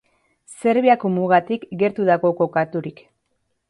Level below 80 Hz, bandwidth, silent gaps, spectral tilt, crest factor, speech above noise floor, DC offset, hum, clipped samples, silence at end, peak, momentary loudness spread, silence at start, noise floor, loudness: -66 dBFS; 11.5 kHz; none; -7 dB/octave; 18 dB; 53 dB; under 0.1%; none; under 0.1%; 0.8 s; -2 dBFS; 10 LU; 0.5 s; -71 dBFS; -19 LUFS